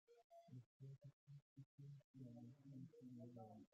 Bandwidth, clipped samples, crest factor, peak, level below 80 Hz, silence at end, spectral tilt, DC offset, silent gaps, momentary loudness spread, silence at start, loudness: 7.4 kHz; under 0.1%; 14 dB; -48 dBFS; under -90 dBFS; 0.05 s; -10 dB/octave; under 0.1%; 0.24-0.30 s, 0.66-0.80 s, 1.13-1.27 s, 1.42-1.56 s, 1.66-1.78 s, 2.04-2.14 s; 6 LU; 0.1 s; -63 LUFS